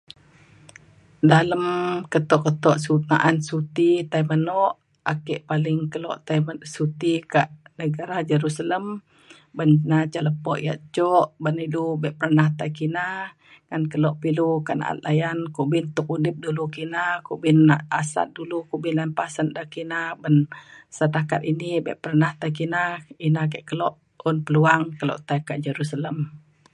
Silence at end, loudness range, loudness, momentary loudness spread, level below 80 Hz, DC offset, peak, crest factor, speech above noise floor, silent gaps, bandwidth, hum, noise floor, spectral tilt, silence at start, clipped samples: 0.35 s; 4 LU; -23 LUFS; 10 LU; -66 dBFS; under 0.1%; 0 dBFS; 22 dB; 30 dB; none; 11 kHz; none; -52 dBFS; -7 dB/octave; 1.25 s; under 0.1%